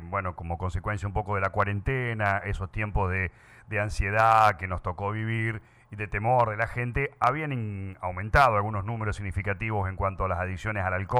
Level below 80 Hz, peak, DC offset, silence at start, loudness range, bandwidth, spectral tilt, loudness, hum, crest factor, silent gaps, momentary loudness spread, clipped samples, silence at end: -40 dBFS; -8 dBFS; under 0.1%; 0 s; 3 LU; 13 kHz; -7 dB/octave; -27 LUFS; none; 20 dB; none; 12 LU; under 0.1%; 0 s